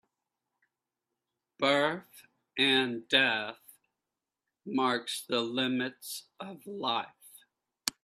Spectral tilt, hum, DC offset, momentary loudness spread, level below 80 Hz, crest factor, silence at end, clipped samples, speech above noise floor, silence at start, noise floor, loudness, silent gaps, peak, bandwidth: -3 dB/octave; none; under 0.1%; 17 LU; -78 dBFS; 26 dB; 0.15 s; under 0.1%; 58 dB; 1.6 s; -89 dBFS; -29 LUFS; none; -8 dBFS; 14.5 kHz